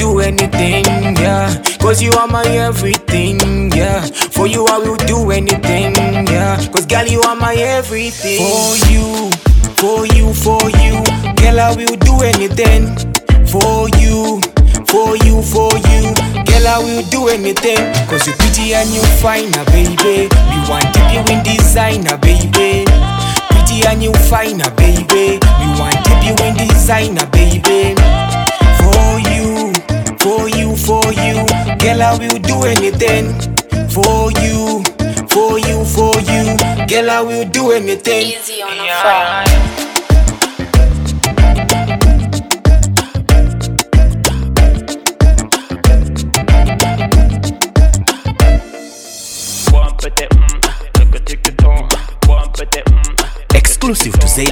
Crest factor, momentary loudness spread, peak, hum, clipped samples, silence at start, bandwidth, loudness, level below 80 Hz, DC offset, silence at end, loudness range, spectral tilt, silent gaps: 10 dB; 5 LU; 0 dBFS; none; under 0.1%; 0 s; over 20 kHz; -11 LUFS; -14 dBFS; under 0.1%; 0 s; 2 LU; -4.5 dB/octave; none